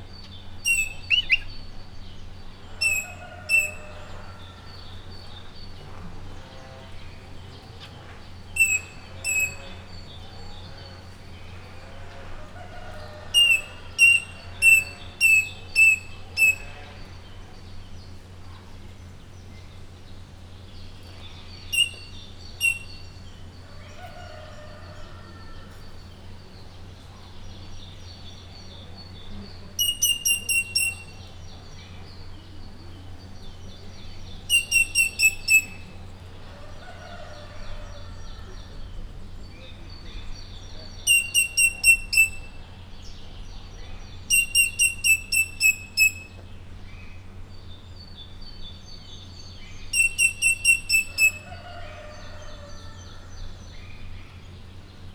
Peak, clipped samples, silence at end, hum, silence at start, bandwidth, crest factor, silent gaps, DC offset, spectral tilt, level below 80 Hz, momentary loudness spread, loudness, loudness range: -6 dBFS; under 0.1%; 0 s; none; 0 s; over 20 kHz; 22 dB; none; under 0.1%; 0 dB/octave; -42 dBFS; 26 LU; -20 LUFS; 24 LU